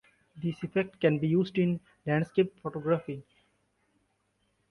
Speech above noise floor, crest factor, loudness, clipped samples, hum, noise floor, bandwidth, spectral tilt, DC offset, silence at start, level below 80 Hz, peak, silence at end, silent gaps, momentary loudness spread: 46 dB; 20 dB; -30 LUFS; under 0.1%; 50 Hz at -60 dBFS; -75 dBFS; 6.4 kHz; -9 dB/octave; under 0.1%; 0.35 s; -68 dBFS; -10 dBFS; 1.5 s; none; 9 LU